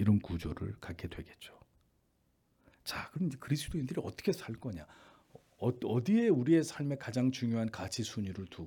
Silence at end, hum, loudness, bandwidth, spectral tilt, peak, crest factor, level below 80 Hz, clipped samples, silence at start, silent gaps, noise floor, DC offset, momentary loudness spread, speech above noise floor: 0 s; none; -35 LUFS; 18 kHz; -6.5 dB/octave; -16 dBFS; 18 dB; -60 dBFS; under 0.1%; 0 s; none; -75 dBFS; under 0.1%; 16 LU; 41 dB